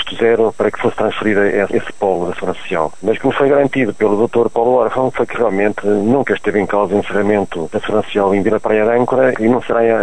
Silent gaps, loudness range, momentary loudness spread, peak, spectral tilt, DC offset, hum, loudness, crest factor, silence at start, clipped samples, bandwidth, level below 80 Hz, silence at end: none; 1 LU; 5 LU; -2 dBFS; -6.5 dB/octave; 3%; none; -15 LUFS; 14 dB; 0 s; under 0.1%; 10.5 kHz; -46 dBFS; 0 s